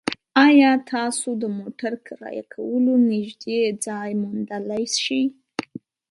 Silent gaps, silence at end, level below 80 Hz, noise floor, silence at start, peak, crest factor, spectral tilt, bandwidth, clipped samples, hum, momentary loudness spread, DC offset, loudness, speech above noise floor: none; 0.5 s; -70 dBFS; -41 dBFS; 0.05 s; -2 dBFS; 18 dB; -3.5 dB/octave; 11.5 kHz; under 0.1%; none; 18 LU; under 0.1%; -21 LUFS; 19 dB